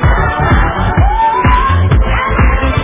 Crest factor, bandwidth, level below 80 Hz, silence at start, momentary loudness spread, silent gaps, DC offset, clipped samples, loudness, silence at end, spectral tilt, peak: 10 dB; 3.8 kHz; -14 dBFS; 0 s; 2 LU; none; under 0.1%; under 0.1%; -11 LUFS; 0 s; -10.5 dB/octave; 0 dBFS